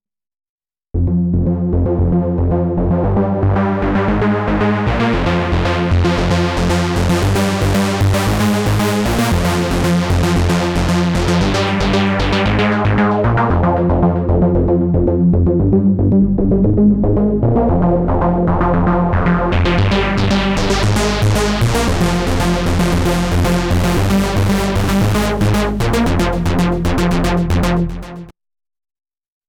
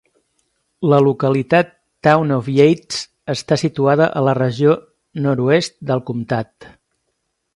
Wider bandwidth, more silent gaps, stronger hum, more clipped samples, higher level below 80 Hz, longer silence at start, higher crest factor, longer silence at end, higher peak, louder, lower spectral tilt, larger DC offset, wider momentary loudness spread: first, 18.5 kHz vs 11.5 kHz; neither; neither; neither; first, -24 dBFS vs -56 dBFS; first, 0.95 s vs 0.8 s; about the same, 12 dB vs 16 dB; first, 1.2 s vs 0.85 s; about the same, -2 dBFS vs 0 dBFS; about the same, -15 LUFS vs -17 LUFS; about the same, -6.5 dB/octave vs -6.5 dB/octave; neither; second, 3 LU vs 11 LU